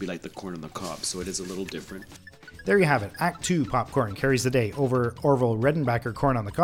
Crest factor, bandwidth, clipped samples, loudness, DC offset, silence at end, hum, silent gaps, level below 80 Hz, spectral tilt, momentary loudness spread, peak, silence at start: 18 dB; 16.5 kHz; under 0.1%; -26 LUFS; under 0.1%; 0 s; none; none; -50 dBFS; -5.5 dB/octave; 15 LU; -8 dBFS; 0 s